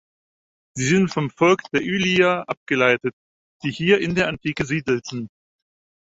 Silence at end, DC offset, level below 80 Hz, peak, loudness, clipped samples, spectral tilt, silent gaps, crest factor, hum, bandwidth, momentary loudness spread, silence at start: 0.85 s; under 0.1%; -54 dBFS; -2 dBFS; -20 LUFS; under 0.1%; -5 dB/octave; 2.57-2.66 s, 3.13-3.60 s; 20 dB; none; 8 kHz; 12 LU; 0.75 s